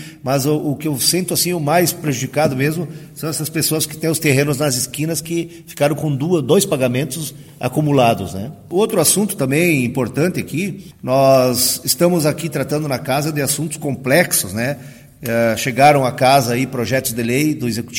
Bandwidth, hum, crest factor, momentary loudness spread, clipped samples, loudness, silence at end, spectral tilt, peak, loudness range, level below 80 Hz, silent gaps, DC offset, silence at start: 17 kHz; none; 18 dB; 10 LU; under 0.1%; -17 LUFS; 0 s; -4.5 dB/octave; 0 dBFS; 3 LU; -52 dBFS; none; under 0.1%; 0 s